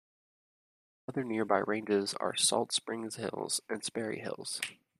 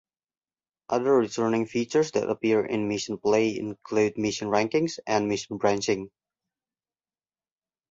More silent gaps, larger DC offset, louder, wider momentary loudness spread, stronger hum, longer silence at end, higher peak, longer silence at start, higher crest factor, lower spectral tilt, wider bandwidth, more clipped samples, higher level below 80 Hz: neither; neither; second, -33 LUFS vs -26 LUFS; first, 10 LU vs 6 LU; neither; second, 0.25 s vs 1.85 s; second, -12 dBFS vs -8 dBFS; first, 1.1 s vs 0.9 s; about the same, 24 dB vs 20 dB; second, -2.5 dB/octave vs -5 dB/octave; first, 14.5 kHz vs 8 kHz; neither; second, -78 dBFS vs -64 dBFS